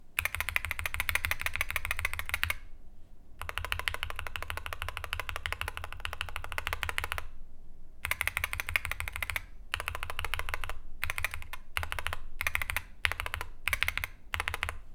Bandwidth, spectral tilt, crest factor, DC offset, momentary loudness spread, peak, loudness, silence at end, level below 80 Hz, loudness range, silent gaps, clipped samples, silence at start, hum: 18 kHz; -1.5 dB/octave; 30 dB; under 0.1%; 8 LU; -4 dBFS; -34 LUFS; 0 s; -42 dBFS; 3 LU; none; under 0.1%; 0 s; none